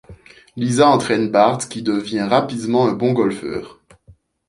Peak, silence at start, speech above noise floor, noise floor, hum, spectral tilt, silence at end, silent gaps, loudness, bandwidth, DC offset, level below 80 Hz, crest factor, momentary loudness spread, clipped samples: -2 dBFS; 0.1 s; 34 dB; -51 dBFS; none; -5.5 dB/octave; 0.75 s; none; -18 LUFS; 11.5 kHz; under 0.1%; -54 dBFS; 18 dB; 12 LU; under 0.1%